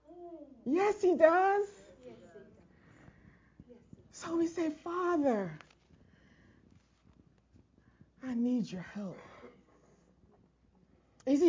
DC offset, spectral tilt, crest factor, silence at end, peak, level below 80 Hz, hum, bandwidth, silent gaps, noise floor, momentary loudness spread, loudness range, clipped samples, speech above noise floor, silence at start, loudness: under 0.1%; -6 dB/octave; 24 dB; 0 s; -10 dBFS; -70 dBFS; none; 7.6 kHz; none; -67 dBFS; 28 LU; 9 LU; under 0.1%; 37 dB; 0.1 s; -32 LUFS